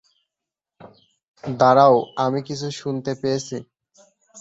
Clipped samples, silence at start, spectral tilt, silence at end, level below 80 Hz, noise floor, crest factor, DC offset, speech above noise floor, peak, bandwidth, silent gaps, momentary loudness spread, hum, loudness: under 0.1%; 1.45 s; -6 dB/octave; 0 s; -64 dBFS; -87 dBFS; 20 dB; under 0.1%; 67 dB; -2 dBFS; 8 kHz; none; 18 LU; none; -19 LUFS